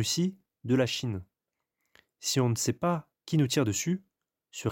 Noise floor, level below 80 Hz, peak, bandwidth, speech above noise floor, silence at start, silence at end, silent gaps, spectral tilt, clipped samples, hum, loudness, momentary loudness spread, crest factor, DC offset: -86 dBFS; -66 dBFS; -14 dBFS; 17 kHz; 58 dB; 0 s; 0 s; none; -4.5 dB/octave; under 0.1%; none; -29 LUFS; 9 LU; 16 dB; under 0.1%